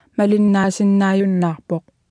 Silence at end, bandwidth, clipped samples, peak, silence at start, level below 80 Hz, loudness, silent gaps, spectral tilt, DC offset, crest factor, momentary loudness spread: 0.3 s; 10.5 kHz; under 0.1%; -6 dBFS; 0.2 s; -62 dBFS; -17 LUFS; none; -7 dB/octave; under 0.1%; 12 dB; 11 LU